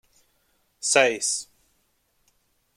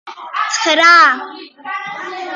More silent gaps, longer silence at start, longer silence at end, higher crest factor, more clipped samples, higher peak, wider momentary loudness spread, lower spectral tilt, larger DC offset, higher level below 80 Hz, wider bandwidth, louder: neither; first, 0.8 s vs 0.05 s; first, 1.35 s vs 0 s; first, 24 dB vs 14 dB; neither; second, -4 dBFS vs 0 dBFS; second, 13 LU vs 19 LU; about the same, -0.5 dB/octave vs 0.5 dB/octave; neither; about the same, -74 dBFS vs -76 dBFS; first, 16 kHz vs 9.6 kHz; second, -22 LUFS vs -10 LUFS